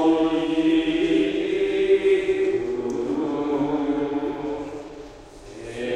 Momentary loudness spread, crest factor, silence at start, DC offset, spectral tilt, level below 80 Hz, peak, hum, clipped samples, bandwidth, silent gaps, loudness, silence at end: 17 LU; 14 dB; 0 s; under 0.1%; -6 dB/octave; -50 dBFS; -8 dBFS; none; under 0.1%; 9.6 kHz; none; -23 LUFS; 0 s